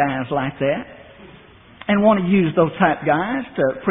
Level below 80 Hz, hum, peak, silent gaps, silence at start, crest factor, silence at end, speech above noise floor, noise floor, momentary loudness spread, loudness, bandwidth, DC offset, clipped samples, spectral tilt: -52 dBFS; none; 0 dBFS; none; 0 s; 18 dB; 0 s; 27 dB; -45 dBFS; 9 LU; -19 LUFS; 3.9 kHz; under 0.1%; under 0.1%; -5.5 dB/octave